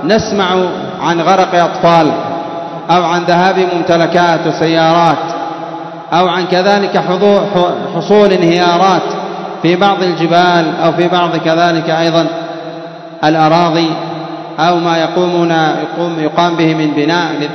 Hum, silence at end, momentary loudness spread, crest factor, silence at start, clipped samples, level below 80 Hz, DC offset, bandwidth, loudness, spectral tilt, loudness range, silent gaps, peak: none; 0 s; 11 LU; 12 dB; 0 s; 0.2%; -52 dBFS; 0.1%; 6.4 kHz; -11 LUFS; -6 dB/octave; 2 LU; none; 0 dBFS